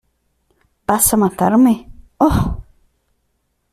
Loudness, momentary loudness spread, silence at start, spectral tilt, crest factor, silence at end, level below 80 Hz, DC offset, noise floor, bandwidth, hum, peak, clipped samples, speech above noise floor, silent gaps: -15 LUFS; 11 LU; 0.9 s; -5.5 dB/octave; 18 dB; 1.1 s; -34 dBFS; under 0.1%; -67 dBFS; 15.5 kHz; none; 0 dBFS; under 0.1%; 54 dB; none